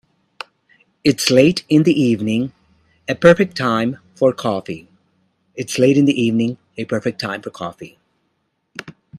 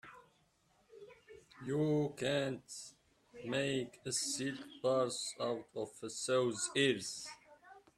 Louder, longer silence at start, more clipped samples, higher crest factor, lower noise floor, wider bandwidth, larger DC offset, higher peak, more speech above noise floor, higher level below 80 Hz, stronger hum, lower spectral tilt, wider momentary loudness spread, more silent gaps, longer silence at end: first, -17 LUFS vs -37 LUFS; first, 1.05 s vs 0.05 s; neither; about the same, 18 dB vs 20 dB; second, -69 dBFS vs -73 dBFS; first, 15 kHz vs 13.5 kHz; neither; first, 0 dBFS vs -20 dBFS; first, 53 dB vs 36 dB; first, -56 dBFS vs -76 dBFS; neither; first, -5.5 dB/octave vs -4 dB/octave; first, 22 LU vs 16 LU; neither; second, 0 s vs 0.2 s